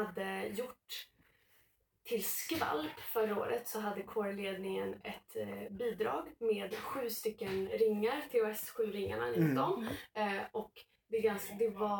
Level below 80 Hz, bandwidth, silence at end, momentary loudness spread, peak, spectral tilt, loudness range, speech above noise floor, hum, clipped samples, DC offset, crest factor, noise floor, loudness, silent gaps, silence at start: -70 dBFS; 19 kHz; 0 s; 10 LU; -20 dBFS; -5 dB/octave; 4 LU; 36 dB; none; under 0.1%; under 0.1%; 18 dB; -73 dBFS; -37 LUFS; none; 0 s